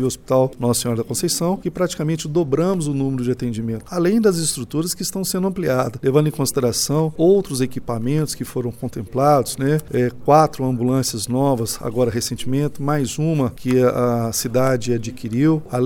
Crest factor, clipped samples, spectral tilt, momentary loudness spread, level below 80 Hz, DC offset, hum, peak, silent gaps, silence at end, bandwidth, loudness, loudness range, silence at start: 18 dB; under 0.1%; -5.5 dB/octave; 7 LU; -46 dBFS; under 0.1%; none; -2 dBFS; none; 0 s; 19 kHz; -20 LUFS; 2 LU; 0 s